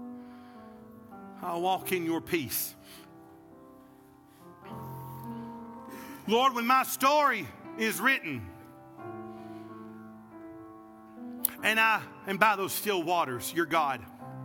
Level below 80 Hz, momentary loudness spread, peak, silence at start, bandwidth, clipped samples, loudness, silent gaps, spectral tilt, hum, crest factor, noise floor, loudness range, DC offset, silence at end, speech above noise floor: -74 dBFS; 25 LU; -4 dBFS; 0 s; 18 kHz; under 0.1%; -28 LUFS; none; -3 dB/octave; none; 26 dB; -56 dBFS; 12 LU; under 0.1%; 0 s; 28 dB